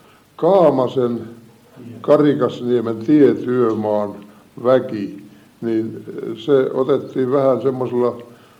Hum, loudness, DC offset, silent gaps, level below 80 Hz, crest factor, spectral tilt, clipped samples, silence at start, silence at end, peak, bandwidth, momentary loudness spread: none; -18 LUFS; under 0.1%; none; -66 dBFS; 16 dB; -8.5 dB/octave; under 0.1%; 0.4 s; 0.35 s; -2 dBFS; 9.4 kHz; 15 LU